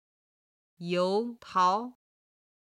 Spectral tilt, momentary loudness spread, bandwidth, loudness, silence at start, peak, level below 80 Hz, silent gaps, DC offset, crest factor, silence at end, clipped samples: -5.5 dB/octave; 14 LU; 11 kHz; -29 LUFS; 0.8 s; -14 dBFS; -80 dBFS; none; under 0.1%; 18 dB; 0.8 s; under 0.1%